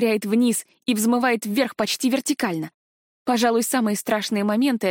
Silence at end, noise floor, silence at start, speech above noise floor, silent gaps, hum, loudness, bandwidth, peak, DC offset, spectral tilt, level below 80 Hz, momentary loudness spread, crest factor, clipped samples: 0 s; under -90 dBFS; 0 s; over 69 dB; 2.74-3.26 s; none; -22 LUFS; 17 kHz; -8 dBFS; under 0.1%; -4 dB/octave; -70 dBFS; 6 LU; 14 dB; under 0.1%